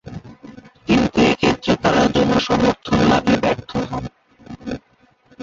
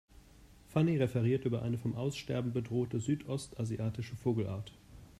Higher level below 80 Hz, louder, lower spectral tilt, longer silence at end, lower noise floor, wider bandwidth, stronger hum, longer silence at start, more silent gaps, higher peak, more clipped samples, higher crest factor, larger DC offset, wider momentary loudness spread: first, -40 dBFS vs -60 dBFS; first, -17 LUFS vs -35 LUFS; second, -5.5 dB/octave vs -7.5 dB/octave; about the same, 0 s vs 0.1 s; about the same, -56 dBFS vs -59 dBFS; second, 7.8 kHz vs 13.5 kHz; neither; second, 0.05 s vs 0.4 s; neither; first, -2 dBFS vs -18 dBFS; neither; about the same, 16 dB vs 18 dB; neither; first, 18 LU vs 8 LU